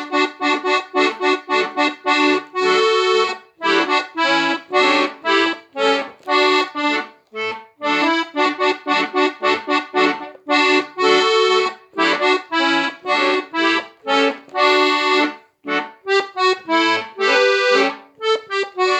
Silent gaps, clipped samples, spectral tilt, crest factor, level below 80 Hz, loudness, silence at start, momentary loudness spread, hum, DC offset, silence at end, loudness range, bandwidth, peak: none; under 0.1%; -2 dB/octave; 16 dB; -80 dBFS; -17 LUFS; 0 s; 8 LU; none; under 0.1%; 0 s; 2 LU; 9 kHz; -2 dBFS